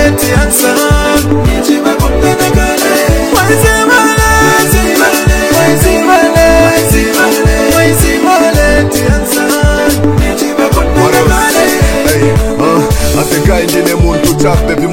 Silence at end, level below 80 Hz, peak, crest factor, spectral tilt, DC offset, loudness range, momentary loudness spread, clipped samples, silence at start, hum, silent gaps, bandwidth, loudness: 0 s; -16 dBFS; 0 dBFS; 8 dB; -4.5 dB/octave; under 0.1%; 2 LU; 4 LU; 2%; 0 s; none; none; over 20 kHz; -8 LUFS